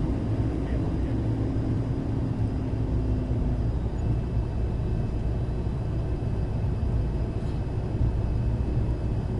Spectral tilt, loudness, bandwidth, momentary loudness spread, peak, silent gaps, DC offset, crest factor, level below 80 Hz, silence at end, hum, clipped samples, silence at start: -9.5 dB/octave; -28 LUFS; 6.8 kHz; 2 LU; -14 dBFS; none; under 0.1%; 12 dB; -30 dBFS; 0 s; none; under 0.1%; 0 s